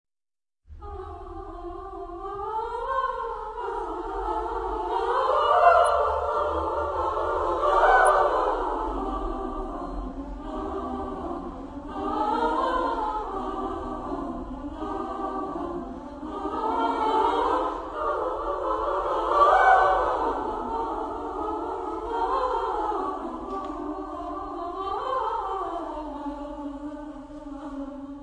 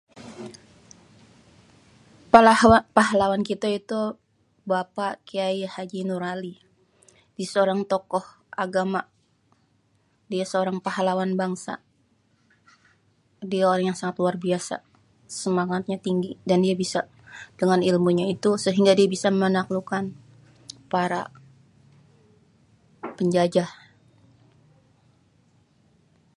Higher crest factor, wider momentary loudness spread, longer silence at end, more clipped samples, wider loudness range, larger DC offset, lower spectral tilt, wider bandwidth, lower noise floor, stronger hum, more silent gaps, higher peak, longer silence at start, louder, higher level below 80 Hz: about the same, 22 dB vs 24 dB; second, 17 LU vs 20 LU; second, 0 s vs 2.65 s; neither; about the same, 10 LU vs 9 LU; neither; about the same, -5.5 dB/octave vs -5.5 dB/octave; about the same, 10.5 kHz vs 11.5 kHz; first, under -90 dBFS vs -66 dBFS; neither; neither; second, -6 dBFS vs 0 dBFS; first, 0.7 s vs 0.15 s; second, -26 LUFS vs -23 LUFS; first, -44 dBFS vs -56 dBFS